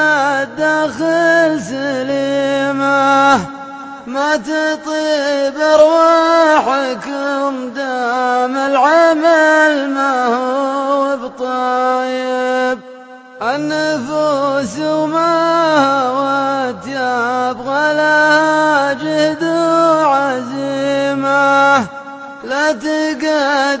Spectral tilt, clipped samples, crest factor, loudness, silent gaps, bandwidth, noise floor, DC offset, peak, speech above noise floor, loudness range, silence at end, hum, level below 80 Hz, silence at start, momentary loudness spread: -4 dB/octave; under 0.1%; 14 dB; -14 LUFS; none; 8 kHz; -35 dBFS; under 0.1%; 0 dBFS; 22 dB; 4 LU; 0 s; none; -58 dBFS; 0 s; 10 LU